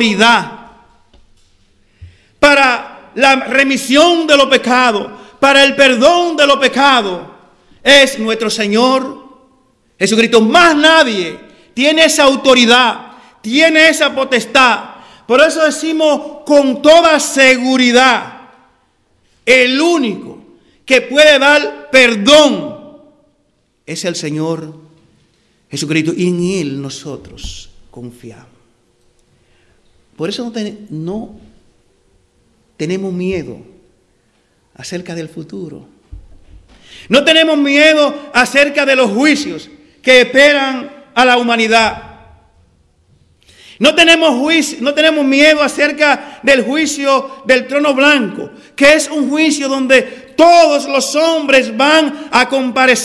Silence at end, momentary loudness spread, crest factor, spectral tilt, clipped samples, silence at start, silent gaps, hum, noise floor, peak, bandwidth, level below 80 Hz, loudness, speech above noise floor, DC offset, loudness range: 0 s; 17 LU; 12 dB; -3 dB/octave; 1%; 0 s; none; none; -59 dBFS; 0 dBFS; 12 kHz; -48 dBFS; -10 LUFS; 48 dB; under 0.1%; 15 LU